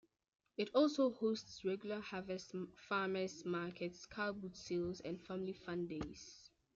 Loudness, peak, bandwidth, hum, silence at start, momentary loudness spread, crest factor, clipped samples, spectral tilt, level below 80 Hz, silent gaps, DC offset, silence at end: -42 LUFS; -22 dBFS; 7.8 kHz; none; 0.6 s; 13 LU; 20 dB; under 0.1%; -5.5 dB/octave; -72 dBFS; none; under 0.1%; 0.3 s